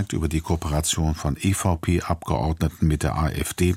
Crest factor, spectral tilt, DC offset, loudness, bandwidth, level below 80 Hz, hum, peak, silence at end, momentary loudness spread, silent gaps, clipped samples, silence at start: 16 dB; -5.5 dB/octave; under 0.1%; -24 LUFS; 16.5 kHz; -32 dBFS; none; -6 dBFS; 0 s; 3 LU; none; under 0.1%; 0 s